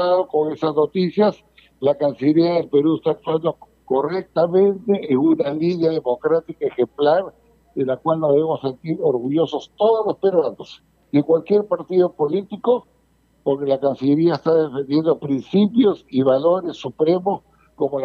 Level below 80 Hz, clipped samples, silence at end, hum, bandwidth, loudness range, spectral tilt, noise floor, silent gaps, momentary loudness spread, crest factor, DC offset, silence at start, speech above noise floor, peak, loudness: -64 dBFS; under 0.1%; 0 s; none; 6.8 kHz; 2 LU; -9 dB/octave; -60 dBFS; none; 7 LU; 14 dB; under 0.1%; 0 s; 41 dB; -6 dBFS; -19 LUFS